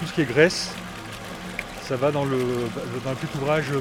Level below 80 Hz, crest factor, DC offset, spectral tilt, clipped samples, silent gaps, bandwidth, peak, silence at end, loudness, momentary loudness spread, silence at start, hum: -50 dBFS; 22 dB; under 0.1%; -5 dB/octave; under 0.1%; none; 17.5 kHz; -4 dBFS; 0 s; -25 LUFS; 15 LU; 0 s; none